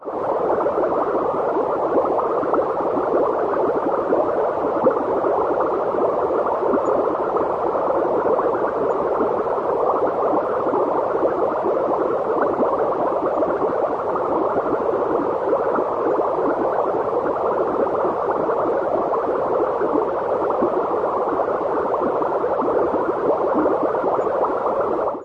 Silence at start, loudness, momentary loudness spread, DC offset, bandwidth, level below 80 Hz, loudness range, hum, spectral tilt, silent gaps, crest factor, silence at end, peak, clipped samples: 0 s; -20 LUFS; 2 LU; under 0.1%; 7.4 kHz; -54 dBFS; 1 LU; none; -8.5 dB/octave; none; 14 dB; 0 s; -6 dBFS; under 0.1%